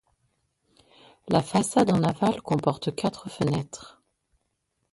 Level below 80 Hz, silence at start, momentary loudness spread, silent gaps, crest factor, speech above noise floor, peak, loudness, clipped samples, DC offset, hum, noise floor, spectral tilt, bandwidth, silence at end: -58 dBFS; 1.25 s; 9 LU; none; 20 dB; 51 dB; -6 dBFS; -25 LUFS; under 0.1%; under 0.1%; none; -76 dBFS; -6 dB/octave; 11.5 kHz; 1.05 s